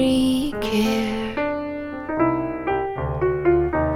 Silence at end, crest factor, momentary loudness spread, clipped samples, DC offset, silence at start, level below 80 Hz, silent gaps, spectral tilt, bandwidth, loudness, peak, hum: 0 s; 14 dB; 8 LU; under 0.1%; under 0.1%; 0 s; -38 dBFS; none; -6 dB/octave; 16 kHz; -22 LUFS; -6 dBFS; none